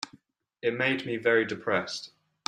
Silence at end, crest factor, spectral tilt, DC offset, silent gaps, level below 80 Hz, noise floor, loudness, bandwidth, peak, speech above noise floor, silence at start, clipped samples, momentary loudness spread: 0.4 s; 20 dB; -4.5 dB/octave; under 0.1%; none; -72 dBFS; -60 dBFS; -28 LUFS; 10.5 kHz; -10 dBFS; 32 dB; 0 s; under 0.1%; 14 LU